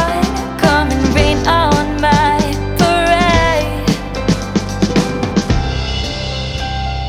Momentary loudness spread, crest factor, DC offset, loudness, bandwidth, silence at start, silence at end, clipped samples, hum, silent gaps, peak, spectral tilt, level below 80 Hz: 8 LU; 14 dB; under 0.1%; -14 LUFS; 16.5 kHz; 0 s; 0 s; under 0.1%; none; none; 0 dBFS; -5 dB/octave; -24 dBFS